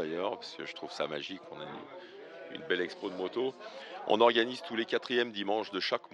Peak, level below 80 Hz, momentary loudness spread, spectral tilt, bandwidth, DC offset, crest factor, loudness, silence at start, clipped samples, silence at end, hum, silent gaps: -10 dBFS; -82 dBFS; 19 LU; -4.5 dB/octave; 10.5 kHz; under 0.1%; 24 dB; -33 LUFS; 0 s; under 0.1%; 0.05 s; none; none